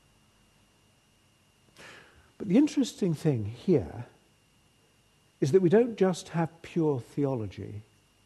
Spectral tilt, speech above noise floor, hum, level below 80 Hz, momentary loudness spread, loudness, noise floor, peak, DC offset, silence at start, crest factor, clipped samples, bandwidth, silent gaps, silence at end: -7 dB/octave; 38 dB; none; -62 dBFS; 21 LU; -28 LUFS; -65 dBFS; -10 dBFS; under 0.1%; 1.8 s; 20 dB; under 0.1%; 12.5 kHz; none; 0.45 s